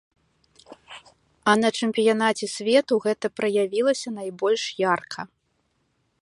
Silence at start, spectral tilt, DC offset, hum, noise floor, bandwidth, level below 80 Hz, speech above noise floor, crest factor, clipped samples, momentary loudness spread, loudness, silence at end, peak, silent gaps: 0.7 s; -4 dB/octave; under 0.1%; none; -71 dBFS; 11.5 kHz; -72 dBFS; 48 dB; 20 dB; under 0.1%; 18 LU; -23 LUFS; 0.95 s; -4 dBFS; none